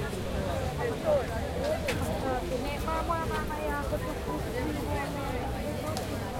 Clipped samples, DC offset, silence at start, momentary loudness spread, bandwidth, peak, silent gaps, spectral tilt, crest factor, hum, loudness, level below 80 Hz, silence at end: under 0.1%; under 0.1%; 0 s; 4 LU; 16.5 kHz; -12 dBFS; none; -5.5 dB/octave; 20 dB; none; -32 LUFS; -40 dBFS; 0 s